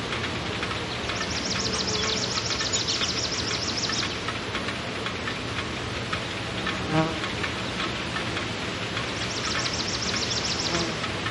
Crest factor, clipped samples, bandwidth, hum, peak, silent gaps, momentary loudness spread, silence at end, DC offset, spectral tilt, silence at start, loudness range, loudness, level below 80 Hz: 18 dB; under 0.1%; 11.5 kHz; none; -10 dBFS; none; 5 LU; 0 s; under 0.1%; -3 dB/octave; 0 s; 3 LU; -27 LUFS; -46 dBFS